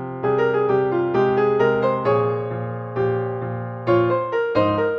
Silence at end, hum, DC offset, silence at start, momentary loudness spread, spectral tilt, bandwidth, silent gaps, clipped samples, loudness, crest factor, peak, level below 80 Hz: 0 s; none; under 0.1%; 0 s; 9 LU; -9 dB/octave; 6.2 kHz; none; under 0.1%; -21 LUFS; 14 dB; -6 dBFS; -56 dBFS